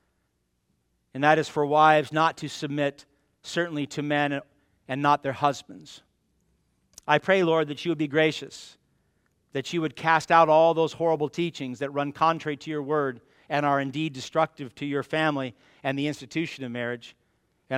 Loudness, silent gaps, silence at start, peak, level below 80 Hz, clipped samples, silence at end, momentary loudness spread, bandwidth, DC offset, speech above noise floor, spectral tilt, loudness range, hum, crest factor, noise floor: -25 LUFS; none; 1.15 s; -4 dBFS; -70 dBFS; under 0.1%; 0 s; 15 LU; 14.5 kHz; under 0.1%; 49 dB; -5.5 dB/octave; 5 LU; none; 22 dB; -74 dBFS